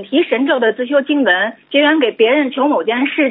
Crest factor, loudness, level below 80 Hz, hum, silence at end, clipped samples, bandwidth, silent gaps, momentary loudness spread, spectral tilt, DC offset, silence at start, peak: 14 dB; -14 LUFS; -74 dBFS; none; 0 s; under 0.1%; 4.1 kHz; none; 3 LU; -7.5 dB/octave; under 0.1%; 0 s; 0 dBFS